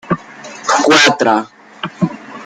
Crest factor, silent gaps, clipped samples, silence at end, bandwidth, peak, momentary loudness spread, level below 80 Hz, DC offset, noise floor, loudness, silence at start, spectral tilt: 16 dB; none; under 0.1%; 0 s; 15 kHz; 0 dBFS; 19 LU; -56 dBFS; under 0.1%; -33 dBFS; -13 LUFS; 0.05 s; -3.5 dB/octave